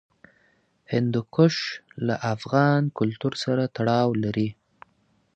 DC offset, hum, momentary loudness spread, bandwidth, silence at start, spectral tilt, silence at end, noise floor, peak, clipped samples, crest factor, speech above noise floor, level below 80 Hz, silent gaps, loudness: under 0.1%; none; 8 LU; 8.6 kHz; 0.9 s; -7 dB/octave; 0.85 s; -66 dBFS; -6 dBFS; under 0.1%; 20 dB; 43 dB; -62 dBFS; none; -24 LUFS